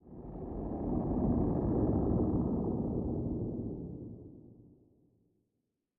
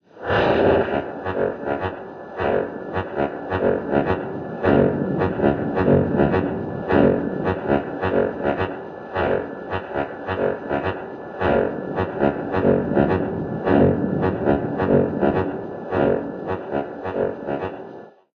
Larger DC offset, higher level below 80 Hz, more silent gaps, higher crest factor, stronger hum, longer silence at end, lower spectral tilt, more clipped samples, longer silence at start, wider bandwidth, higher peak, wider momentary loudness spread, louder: neither; about the same, -46 dBFS vs -46 dBFS; neither; about the same, 16 dB vs 18 dB; neither; first, 1.45 s vs 0.25 s; first, -14 dB/octave vs -9.5 dB/octave; neither; about the same, 0.05 s vs 0.15 s; second, 2.3 kHz vs 6.4 kHz; second, -18 dBFS vs -2 dBFS; first, 15 LU vs 10 LU; second, -34 LUFS vs -22 LUFS